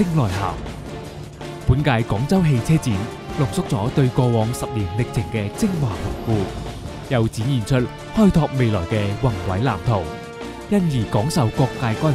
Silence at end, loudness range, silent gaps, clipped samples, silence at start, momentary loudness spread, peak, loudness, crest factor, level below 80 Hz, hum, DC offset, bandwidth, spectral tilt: 0 s; 3 LU; none; under 0.1%; 0 s; 13 LU; -2 dBFS; -21 LUFS; 18 dB; -36 dBFS; none; under 0.1%; 14.5 kHz; -7 dB/octave